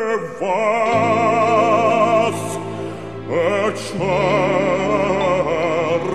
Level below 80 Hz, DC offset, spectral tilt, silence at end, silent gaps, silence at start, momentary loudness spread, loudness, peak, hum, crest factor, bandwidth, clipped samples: -46 dBFS; 0.7%; -5.5 dB/octave; 0 s; none; 0 s; 10 LU; -18 LUFS; -4 dBFS; none; 14 dB; 13 kHz; under 0.1%